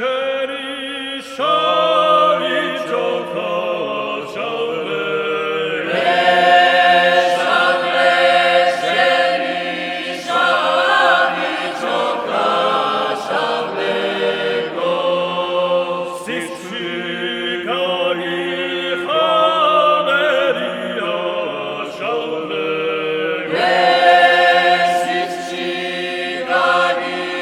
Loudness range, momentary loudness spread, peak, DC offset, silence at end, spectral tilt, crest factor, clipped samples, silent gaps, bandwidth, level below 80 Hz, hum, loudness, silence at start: 7 LU; 10 LU; 0 dBFS; under 0.1%; 0 s; -3.5 dB/octave; 16 dB; under 0.1%; none; 14 kHz; -64 dBFS; none; -16 LUFS; 0 s